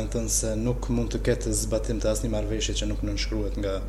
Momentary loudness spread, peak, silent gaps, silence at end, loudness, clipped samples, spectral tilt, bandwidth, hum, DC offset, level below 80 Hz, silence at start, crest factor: 4 LU; -10 dBFS; none; 0 s; -27 LUFS; under 0.1%; -4.5 dB/octave; 14 kHz; none; under 0.1%; -30 dBFS; 0 s; 16 dB